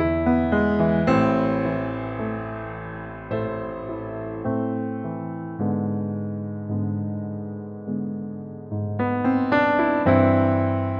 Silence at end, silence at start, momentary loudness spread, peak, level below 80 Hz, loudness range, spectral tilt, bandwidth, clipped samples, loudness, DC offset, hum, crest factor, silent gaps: 0 s; 0 s; 13 LU; -4 dBFS; -46 dBFS; 7 LU; -9.5 dB/octave; 6.2 kHz; under 0.1%; -24 LUFS; under 0.1%; none; 20 dB; none